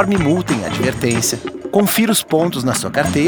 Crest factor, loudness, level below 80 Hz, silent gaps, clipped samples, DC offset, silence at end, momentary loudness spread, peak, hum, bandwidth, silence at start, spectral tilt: 16 dB; -16 LUFS; -44 dBFS; none; under 0.1%; under 0.1%; 0 s; 5 LU; 0 dBFS; none; over 20 kHz; 0 s; -4.5 dB/octave